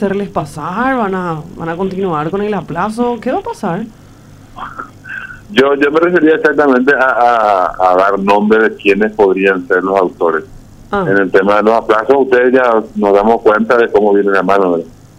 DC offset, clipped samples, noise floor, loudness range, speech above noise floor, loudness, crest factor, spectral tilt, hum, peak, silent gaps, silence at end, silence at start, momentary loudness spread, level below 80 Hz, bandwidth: under 0.1%; under 0.1%; -37 dBFS; 8 LU; 26 dB; -12 LUFS; 12 dB; -6.5 dB/octave; none; 0 dBFS; none; 0.3 s; 0 s; 11 LU; -42 dBFS; 11.5 kHz